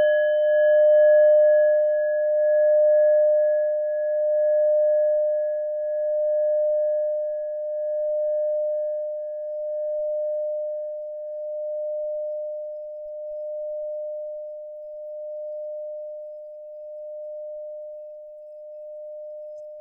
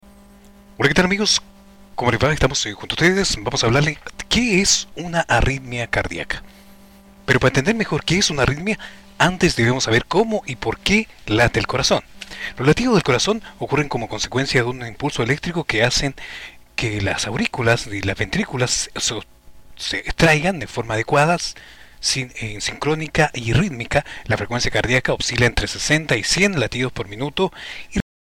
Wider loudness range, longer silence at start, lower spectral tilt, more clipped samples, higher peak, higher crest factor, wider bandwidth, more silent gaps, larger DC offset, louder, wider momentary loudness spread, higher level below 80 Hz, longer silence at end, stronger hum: first, 17 LU vs 3 LU; second, 0 s vs 0.8 s; about the same, -3 dB/octave vs -4 dB/octave; neither; second, -10 dBFS vs -4 dBFS; about the same, 12 dB vs 16 dB; second, 3.2 kHz vs 16.5 kHz; neither; neither; second, -22 LUFS vs -19 LUFS; first, 20 LU vs 10 LU; second, -74 dBFS vs -36 dBFS; second, 0 s vs 0.35 s; neither